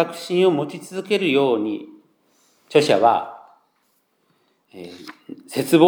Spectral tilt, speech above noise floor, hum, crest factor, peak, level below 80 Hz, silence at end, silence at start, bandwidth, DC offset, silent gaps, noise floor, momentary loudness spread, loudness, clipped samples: -5.5 dB/octave; 47 dB; none; 20 dB; -2 dBFS; -80 dBFS; 0 s; 0 s; over 20 kHz; under 0.1%; none; -66 dBFS; 22 LU; -20 LUFS; under 0.1%